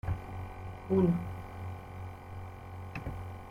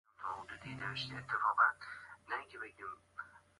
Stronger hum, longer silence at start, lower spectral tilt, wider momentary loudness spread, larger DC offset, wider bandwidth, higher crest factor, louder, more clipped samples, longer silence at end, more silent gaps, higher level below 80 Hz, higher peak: neither; second, 0.05 s vs 0.2 s; first, -9 dB/octave vs -4 dB/octave; about the same, 17 LU vs 19 LU; neither; first, 15.5 kHz vs 11.5 kHz; about the same, 20 dB vs 22 dB; about the same, -37 LUFS vs -38 LUFS; neither; second, 0 s vs 0.2 s; neither; first, -50 dBFS vs -72 dBFS; about the same, -16 dBFS vs -18 dBFS